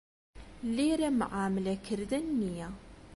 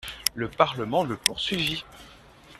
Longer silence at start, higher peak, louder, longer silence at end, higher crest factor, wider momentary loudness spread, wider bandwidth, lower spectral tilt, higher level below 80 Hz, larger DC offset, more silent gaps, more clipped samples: first, 0.35 s vs 0.05 s; second, -18 dBFS vs 0 dBFS; second, -32 LUFS vs -26 LUFS; about the same, 0 s vs 0 s; second, 14 dB vs 28 dB; first, 12 LU vs 6 LU; second, 11.5 kHz vs 14.5 kHz; first, -6 dB/octave vs -3 dB/octave; about the same, -54 dBFS vs -54 dBFS; neither; neither; neither